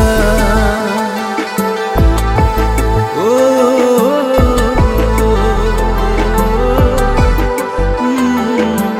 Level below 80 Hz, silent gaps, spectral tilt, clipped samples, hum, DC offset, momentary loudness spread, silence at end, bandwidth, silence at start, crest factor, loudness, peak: -16 dBFS; none; -6 dB/octave; under 0.1%; none; under 0.1%; 5 LU; 0 s; 16 kHz; 0 s; 12 dB; -13 LUFS; 0 dBFS